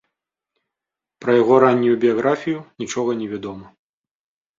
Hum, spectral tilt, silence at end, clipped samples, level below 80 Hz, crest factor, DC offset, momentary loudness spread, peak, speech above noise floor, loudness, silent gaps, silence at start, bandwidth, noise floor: none; -6 dB/octave; 0.95 s; under 0.1%; -62 dBFS; 20 dB; under 0.1%; 15 LU; -2 dBFS; over 72 dB; -18 LUFS; none; 1.2 s; 7.6 kHz; under -90 dBFS